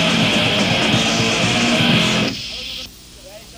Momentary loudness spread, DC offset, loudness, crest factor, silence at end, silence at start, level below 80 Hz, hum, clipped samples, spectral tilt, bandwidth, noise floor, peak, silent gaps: 12 LU; under 0.1%; -15 LUFS; 14 dB; 0 s; 0 s; -42 dBFS; none; under 0.1%; -3.5 dB/octave; 16 kHz; -39 dBFS; -4 dBFS; none